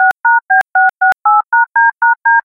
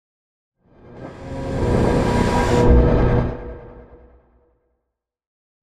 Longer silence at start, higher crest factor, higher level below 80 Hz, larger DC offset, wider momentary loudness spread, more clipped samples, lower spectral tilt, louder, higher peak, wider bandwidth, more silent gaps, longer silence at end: second, 0 s vs 0.9 s; second, 10 dB vs 18 dB; second, -64 dBFS vs -26 dBFS; neither; second, 2 LU vs 22 LU; neither; second, -1.5 dB/octave vs -7.5 dB/octave; first, -11 LUFS vs -18 LUFS; about the same, -2 dBFS vs -2 dBFS; second, 8.6 kHz vs 11.5 kHz; neither; second, 0.05 s vs 1.8 s